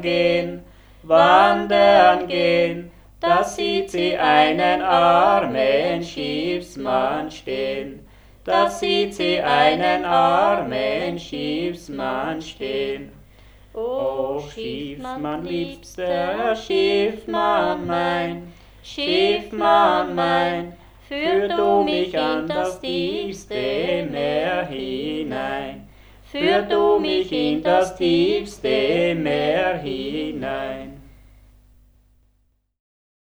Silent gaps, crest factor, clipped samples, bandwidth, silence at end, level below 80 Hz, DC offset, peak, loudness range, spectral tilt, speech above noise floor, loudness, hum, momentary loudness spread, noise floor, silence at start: none; 20 dB; under 0.1%; over 20 kHz; 2.25 s; -48 dBFS; under 0.1%; 0 dBFS; 9 LU; -5 dB/octave; 45 dB; -20 LUFS; none; 13 LU; -65 dBFS; 0 s